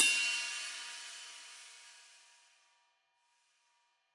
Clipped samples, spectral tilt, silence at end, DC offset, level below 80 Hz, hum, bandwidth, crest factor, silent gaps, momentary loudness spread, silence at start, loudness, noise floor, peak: under 0.1%; 5 dB/octave; 2.05 s; under 0.1%; under -90 dBFS; none; 11.5 kHz; 28 dB; none; 23 LU; 0 s; -35 LUFS; -77 dBFS; -12 dBFS